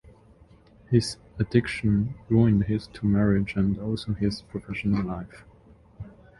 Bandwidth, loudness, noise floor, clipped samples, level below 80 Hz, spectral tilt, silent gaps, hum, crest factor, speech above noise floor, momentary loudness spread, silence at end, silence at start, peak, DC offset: 11.5 kHz; -26 LUFS; -54 dBFS; under 0.1%; -44 dBFS; -7.5 dB/octave; none; none; 20 dB; 30 dB; 14 LU; 0.3 s; 0.9 s; -6 dBFS; under 0.1%